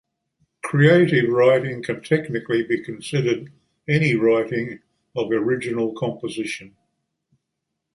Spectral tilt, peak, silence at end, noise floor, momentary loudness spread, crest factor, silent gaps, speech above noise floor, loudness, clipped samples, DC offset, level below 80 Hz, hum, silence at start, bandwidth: -7 dB/octave; -2 dBFS; 1.3 s; -80 dBFS; 13 LU; 20 dB; none; 60 dB; -21 LUFS; under 0.1%; under 0.1%; -62 dBFS; none; 0.65 s; 11.5 kHz